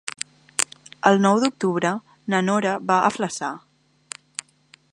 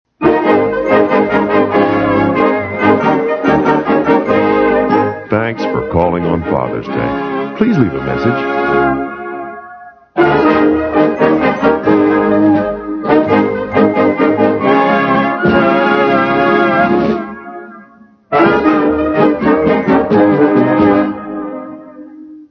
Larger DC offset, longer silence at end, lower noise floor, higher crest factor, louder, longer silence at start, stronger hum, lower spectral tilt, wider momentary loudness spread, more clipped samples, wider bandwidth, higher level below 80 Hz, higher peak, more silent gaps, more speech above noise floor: neither; first, 1.35 s vs 0.05 s; first, -56 dBFS vs -42 dBFS; first, 24 dB vs 12 dB; second, -22 LUFS vs -12 LUFS; second, 0.05 s vs 0.2 s; neither; second, -4.5 dB/octave vs -8.5 dB/octave; first, 18 LU vs 9 LU; neither; first, 16 kHz vs 6.4 kHz; second, -68 dBFS vs -40 dBFS; about the same, 0 dBFS vs 0 dBFS; neither; first, 36 dB vs 29 dB